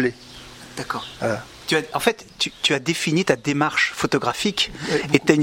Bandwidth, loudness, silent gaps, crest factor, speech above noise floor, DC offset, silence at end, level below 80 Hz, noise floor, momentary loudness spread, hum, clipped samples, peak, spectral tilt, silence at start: 16.5 kHz; -22 LUFS; none; 22 dB; 19 dB; under 0.1%; 0 s; -52 dBFS; -41 dBFS; 10 LU; none; under 0.1%; 0 dBFS; -4 dB/octave; 0 s